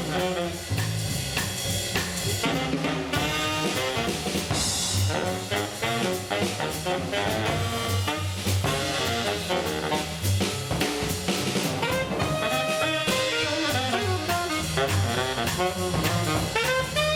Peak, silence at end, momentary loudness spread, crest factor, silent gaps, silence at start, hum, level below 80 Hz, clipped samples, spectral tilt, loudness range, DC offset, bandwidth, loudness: -10 dBFS; 0 s; 3 LU; 16 dB; none; 0 s; none; -46 dBFS; under 0.1%; -3.5 dB/octave; 2 LU; under 0.1%; 19.5 kHz; -26 LUFS